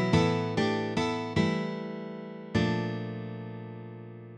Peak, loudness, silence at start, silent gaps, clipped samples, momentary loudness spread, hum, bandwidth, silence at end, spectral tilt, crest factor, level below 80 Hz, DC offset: -12 dBFS; -30 LUFS; 0 s; none; under 0.1%; 14 LU; none; 9.8 kHz; 0 s; -6.5 dB/octave; 20 dB; -56 dBFS; under 0.1%